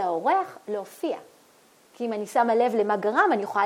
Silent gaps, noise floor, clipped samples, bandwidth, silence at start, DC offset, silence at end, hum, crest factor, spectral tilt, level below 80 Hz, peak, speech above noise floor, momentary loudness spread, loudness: none; -58 dBFS; under 0.1%; 16.5 kHz; 0 s; under 0.1%; 0 s; none; 16 dB; -5 dB/octave; -84 dBFS; -8 dBFS; 33 dB; 12 LU; -25 LUFS